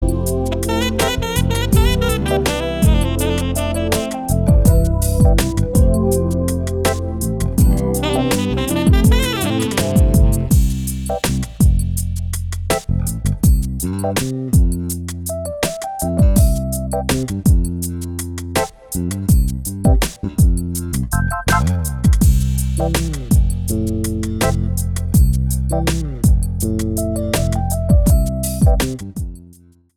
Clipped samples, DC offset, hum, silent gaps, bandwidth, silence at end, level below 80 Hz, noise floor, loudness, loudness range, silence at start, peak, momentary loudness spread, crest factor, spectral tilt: under 0.1%; under 0.1%; none; none; 18 kHz; 0.5 s; -20 dBFS; -46 dBFS; -18 LUFS; 3 LU; 0 s; 0 dBFS; 8 LU; 16 dB; -5.5 dB/octave